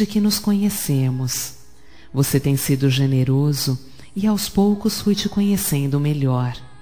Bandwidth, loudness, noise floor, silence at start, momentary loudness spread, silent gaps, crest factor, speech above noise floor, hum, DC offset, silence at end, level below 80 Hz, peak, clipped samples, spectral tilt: 19 kHz; -20 LUFS; -48 dBFS; 0 s; 6 LU; none; 16 dB; 29 dB; none; 1%; 0.15 s; -46 dBFS; -4 dBFS; under 0.1%; -5.5 dB/octave